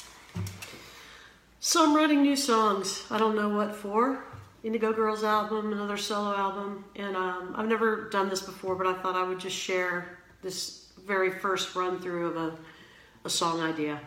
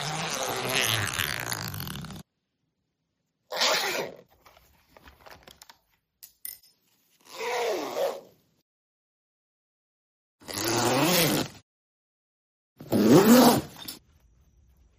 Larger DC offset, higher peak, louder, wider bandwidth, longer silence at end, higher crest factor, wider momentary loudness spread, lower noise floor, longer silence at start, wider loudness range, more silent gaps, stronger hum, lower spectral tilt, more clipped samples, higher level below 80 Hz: neither; second, -12 dBFS vs -4 dBFS; second, -28 LUFS vs -24 LUFS; about the same, 17 kHz vs 15.5 kHz; second, 0 s vs 1 s; second, 18 dB vs 24 dB; second, 16 LU vs 22 LU; second, -54 dBFS vs -79 dBFS; about the same, 0 s vs 0 s; second, 5 LU vs 13 LU; second, none vs 8.62-10.39 s, 11.62-12.76 s; neither; about the same, -3.5 dB/octave vs -4 dB/octave; neither; second, -66 dBFS vs -60 dBFS